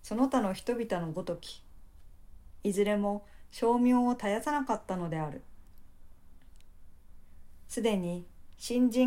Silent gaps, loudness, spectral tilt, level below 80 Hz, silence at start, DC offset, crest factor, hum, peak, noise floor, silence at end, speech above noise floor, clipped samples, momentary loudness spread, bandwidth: none; -31 LUFS; -6 dB/octave; -54 dBFS; 0 s; under 0.1%; 16 dB; none; -16 dBFS; -50 dBFS; 0 s; 21 dB; under 0.1%; 14 LU; 16 kHz